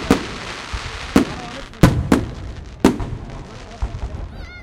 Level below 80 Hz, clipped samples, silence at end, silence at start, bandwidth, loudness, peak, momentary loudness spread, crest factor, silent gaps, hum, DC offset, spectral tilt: -30 dBFS; under 0.1%; 0 s; 0 s; 16.5 kHz; -21 LUFS; 0 dBFS; 18 LU; 20 dB; none; none; under 0.1%; -6 dB/octave